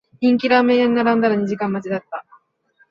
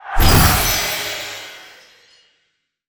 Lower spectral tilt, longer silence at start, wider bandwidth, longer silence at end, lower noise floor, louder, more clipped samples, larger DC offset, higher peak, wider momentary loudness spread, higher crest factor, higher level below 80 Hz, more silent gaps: first, -7 dB/octave vs -3 dB/octave; first, 0.2 s vs 0.05 s; second, 6.8 kHz vs over 20 kHz; second, 0.7 s vs 1.2 s; second, -60 dBFS vs -69 dBFS; second, -18 LUFS vs -15 LUFS; neither; neither; second, -4 dBFS vs 0 dBFS; second, 12 LU vs 21 LU; about the same, 16 dB vs 18 dB; second, -64 dBFS vs -24 dBFS; neither